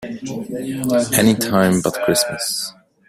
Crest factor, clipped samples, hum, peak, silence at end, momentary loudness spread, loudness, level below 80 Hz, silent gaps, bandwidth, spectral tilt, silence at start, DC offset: 16 dB; under 0.1%; none; -2 dBFS; 0.4 s; 13 LU; -18 LUFS; -52 dBFS; none; 16 kHz; -4 dB/octave; 0 s; under 0.1%